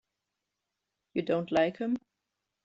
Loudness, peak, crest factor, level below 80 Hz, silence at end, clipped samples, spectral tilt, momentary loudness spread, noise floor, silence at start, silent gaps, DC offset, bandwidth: -31 LUFS; -14 dBFS; 20 dB; -70 dBFS; 0.65 s; under 0.1%; -5 dB/octave; 9 LU; -86 dBFS; 1.15 s; none; under 0.1%; 7.8 kHz